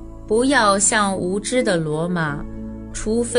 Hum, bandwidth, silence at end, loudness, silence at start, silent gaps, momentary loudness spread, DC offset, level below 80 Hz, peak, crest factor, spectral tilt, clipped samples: none; 11 kHz; 0 s; -19 LUFS; 0 s; none; 15 LU; under 0.1%; -38 dBFS; -2 dBFS; 18 dB; -3.5 dB/octave; under 0.1%